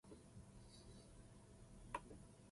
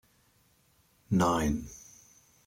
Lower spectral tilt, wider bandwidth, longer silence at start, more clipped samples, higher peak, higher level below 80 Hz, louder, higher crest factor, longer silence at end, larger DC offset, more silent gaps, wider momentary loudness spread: about the same, -5 dB/octave vs -6 dB/octave; second, 11.5 kHz vs 16.5 kHz; second, 0.05 s vs 1.1 s; neither; second, -32 dBFS vs -12 dBFS; second, -68 dBFS vs -50 dBFS; second, -59 LUFS vs -29 LUFS; first, 28 dB vs 20 dB; second, 0 s vs 0.65 s; neither; neither; second, 11 LU vs 23 LU